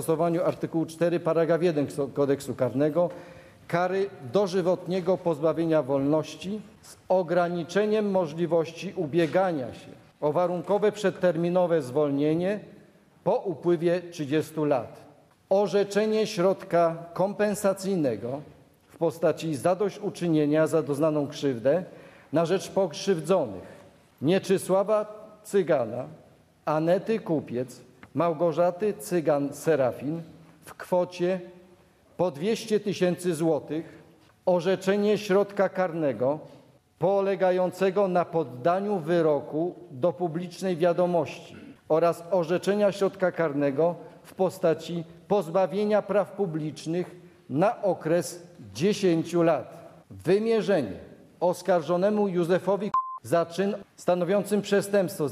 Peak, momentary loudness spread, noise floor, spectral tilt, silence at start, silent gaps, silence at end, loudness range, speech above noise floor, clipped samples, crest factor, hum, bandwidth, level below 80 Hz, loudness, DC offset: -10 dBFS; 9 LU; -58 dBFS; -6.5 dB/octave; 0 s; none; 0 s; 2 LU; 32 dB; under 0.1%; 16 dB; none; 14.5 kHz; -70 dBFS; -26 LUFS; under 0.1%